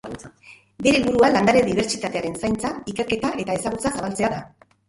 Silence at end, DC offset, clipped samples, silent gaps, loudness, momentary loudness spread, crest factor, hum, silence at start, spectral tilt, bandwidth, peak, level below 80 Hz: 0.4 s; under 0.1%; under 0.1%; none; -21 LUFS; 11 LU; 18 dB; none; 0.05 s; -4.5 dB/octave; 11.5 kHz; -4 dBFS; -48 dBFS